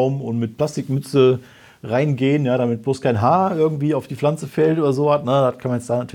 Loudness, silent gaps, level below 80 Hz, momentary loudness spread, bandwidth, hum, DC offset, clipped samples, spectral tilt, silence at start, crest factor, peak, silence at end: -19 LUFS; none; -62 dBFS; 7 LU; 14.5 kHz; none; under 0.1%; under 0.1%; -7.5 dB/octave; 0 s; 16 dB; -4 dBFS; 0.05 s